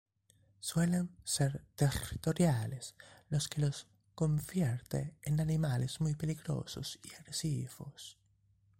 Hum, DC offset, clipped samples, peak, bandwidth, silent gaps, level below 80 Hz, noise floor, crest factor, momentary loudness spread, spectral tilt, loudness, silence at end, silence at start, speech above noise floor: none; under 0.1%; under 0.1%; -18 dBFS; 16 kHz; none; -58 dBFS; -71 dBFS; 18 dB; 14 LU; -5.5 dB/octave; -36 LUFS; 0.65 s; 0.6 s; 36 dB